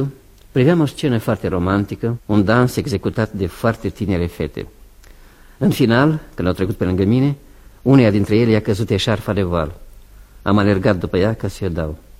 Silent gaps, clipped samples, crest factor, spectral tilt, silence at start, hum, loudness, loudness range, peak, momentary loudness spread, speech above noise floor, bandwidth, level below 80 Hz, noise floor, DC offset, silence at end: none; under 0.1%; 18 dB; -7 dB/octave; 0 s; none; -18 LUFS; 3 LU; 0 dBFS; 9 LU; 27 dB; 16 kHz; -38 dBFS; -43 dBFS; under 0.1%; 0.25 s